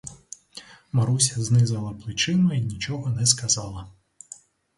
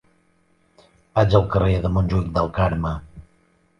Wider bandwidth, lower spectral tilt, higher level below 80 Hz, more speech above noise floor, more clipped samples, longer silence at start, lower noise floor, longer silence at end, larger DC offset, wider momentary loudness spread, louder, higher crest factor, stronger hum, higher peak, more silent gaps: first, 11.5 kHz vs 6.6 kHz; second, -4 dB/octave vs -8.5 dB/octave; second, -52 dBFS vs -34 dBFS; second, 25 dB vs 42 dB; neither; second, 0.05 s vs 1.15 s; second, -48 dBFS vs -61 dBFS; first, 0.85 s vs 0.6 s; neither; first, 22 LU vs 9 LU; about the same, -23 LUFS vs -21 LUFS; about the same, 20 dB vs 20 dB; neither; about the same, -4 dBFS vs -2 dBFS; neither